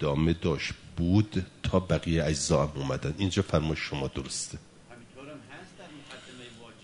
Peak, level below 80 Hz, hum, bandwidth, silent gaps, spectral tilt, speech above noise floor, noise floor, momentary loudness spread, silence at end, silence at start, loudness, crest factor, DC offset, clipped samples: -10 dBFS; -42 dBFS; none; 11 kHz; none; -5.5 dB/octave; 23 dB; -51 dBFS; 20 LU; 0.1 s; 0 s; -29 LUFS; 20 dB; under 0.1%; under 0.1%